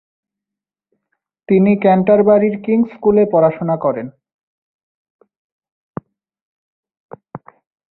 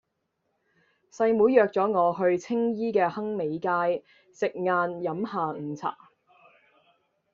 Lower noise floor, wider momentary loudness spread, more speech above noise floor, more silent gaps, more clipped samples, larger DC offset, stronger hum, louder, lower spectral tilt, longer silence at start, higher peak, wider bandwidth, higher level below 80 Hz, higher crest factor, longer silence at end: first, -86 dBFS vs -78 dBFS; first, 22 LU vs 11 LU; first, 73 dB vs 52 dB; first, 4.34-5.19 s, 5.37-5.60 s, 5.72-5.94 s, 6.42-6.83 s, 7.00-7.09 s vs none; neither; neither; neither; first, -14 LUFS vs -26 LUFS; first, -12.5 dB/octave vs -5.5 dB/octave; first, 1.5 s vs 1.15 s; first, -2 dBFS vs -6 dBFS; second, 4.2 kHz vs 7.4 kHz; first, -56 dBFS vs -72 dBFS; second, 16 dB vs 22 dB; second, 0.55 s vs 1.4 s